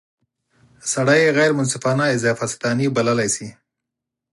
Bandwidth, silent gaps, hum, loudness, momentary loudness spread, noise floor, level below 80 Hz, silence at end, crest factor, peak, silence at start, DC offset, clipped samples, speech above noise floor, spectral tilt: 11.5 kHz; none; none; -19 LUFS; 9 LU; -83 dBFS; -60 dBFS; 0.8 s; 18 dB; -4 dBFS; 0.85 s; under 0.1%; under 0.1%; 65 dB; -4.5 dB/octave